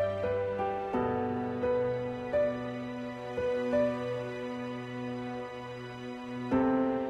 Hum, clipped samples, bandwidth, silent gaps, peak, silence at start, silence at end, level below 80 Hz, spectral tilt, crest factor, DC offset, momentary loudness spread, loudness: none; under 0.1%; 8.4 kHz; none; -16 dBFS; 0 s; 0 s; -58 dBFS; -7.5 dB/octave; 16 dB; under 0.1%; 11 LU; -33 LUFS